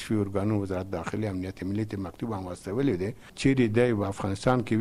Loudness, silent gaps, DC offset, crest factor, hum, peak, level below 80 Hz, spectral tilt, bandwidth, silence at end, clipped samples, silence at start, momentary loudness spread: -28 LUFS; none; under 0.1%; 18 dB; none; -10 dBFS; -52 dBFS; -7 dB/octave; 14 kHz; 0 s; under 0.1%; 0 s; 10 LU